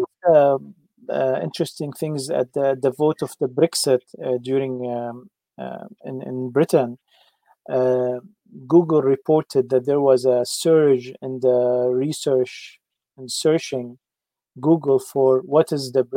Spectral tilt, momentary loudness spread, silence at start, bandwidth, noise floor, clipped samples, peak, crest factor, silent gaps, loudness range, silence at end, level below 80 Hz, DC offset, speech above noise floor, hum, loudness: -5.5 dB/octave; 15 LU; 0 s; 16.5 kHz; -88 dBFS; under 0.1%; -4 dBFS; 16 dB; none; 6 LU; 0 s; -72 dBFS; under 0.1%; 68 dB; none; -20 LUFS